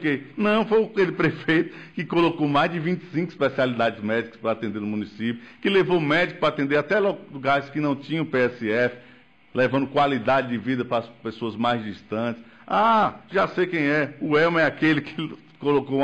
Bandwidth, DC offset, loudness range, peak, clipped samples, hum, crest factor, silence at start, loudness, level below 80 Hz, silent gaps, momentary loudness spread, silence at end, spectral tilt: 8.6 kHz; under 0.1%; 3 LU; -12 dBFS; under 0.1%; none; 12 dB; 0 s; -23 LUFS; -60 dBFS; none; 9 LU; 0 s; -7 dB/octave